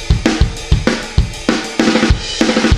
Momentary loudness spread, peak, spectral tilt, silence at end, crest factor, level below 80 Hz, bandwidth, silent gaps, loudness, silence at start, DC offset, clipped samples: 4 LU; 0 dBFS; -5 dB/octave; 0 s; 14 dB; -20 dBFS; 13 kHz; none; -15 LUFS; 0 s; under 0.1%; under 0.1%